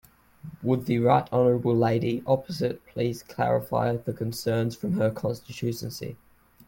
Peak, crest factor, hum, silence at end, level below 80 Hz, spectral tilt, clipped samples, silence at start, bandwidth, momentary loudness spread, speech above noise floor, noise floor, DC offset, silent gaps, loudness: -8 dBFS; 18 dB; none; 0.5 s; -58 dBFS; -7 dB/octave; under 0.1%; 0.45 s; 17 kHz; 11 LU; 21 dB; -46 dBFS; under 0.1%; none; -26 LUFS